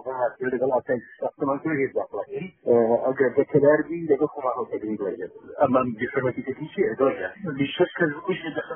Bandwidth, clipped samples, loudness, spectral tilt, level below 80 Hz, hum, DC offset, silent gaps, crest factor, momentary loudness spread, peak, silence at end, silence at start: 3.5 kHz; under 0.1%; -24 LUFS; -3 dB/octave; -64 dBFS; none; under 0.1%; none; 18 dB; 12 LU; -6 dBFS; 0 s; 0.05 s